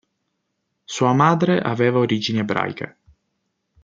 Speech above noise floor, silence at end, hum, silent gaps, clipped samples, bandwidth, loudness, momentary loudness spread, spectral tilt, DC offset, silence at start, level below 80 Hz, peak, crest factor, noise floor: 56 dB; 0.95 s; none; none; under 0.1%; 7.8 kHz; -19 LUFS; 15 LU; -6 dB/octave; under 0.1%; 0.9 s; -64 dBFS; -2 dBFS; 20 dB; -75 dBFS